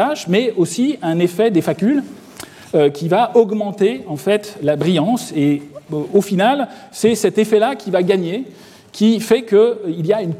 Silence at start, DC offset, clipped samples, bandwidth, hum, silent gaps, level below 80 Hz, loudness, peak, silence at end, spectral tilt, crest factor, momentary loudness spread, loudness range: 0 s; under 0.1%; under 0.1%; 15.5 kHz; none; none; -62 dBFS; -17 LUFS; -2 dBFS; 0 s; -6 dB/octave; 16 dB; 10 LU; 1 LU